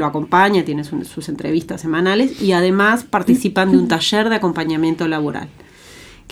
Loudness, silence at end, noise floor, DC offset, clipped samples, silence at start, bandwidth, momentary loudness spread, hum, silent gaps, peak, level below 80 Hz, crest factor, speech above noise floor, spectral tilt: -16 LUFS; 0.25 s; -41 dBFS; under 0.1%; under 0.1%; 0 s; 15.5 kHz; 11 LU; none; none; 0 dBFS; -52 dBFS; 16 dB; 25 dB; -5.5 dB/octave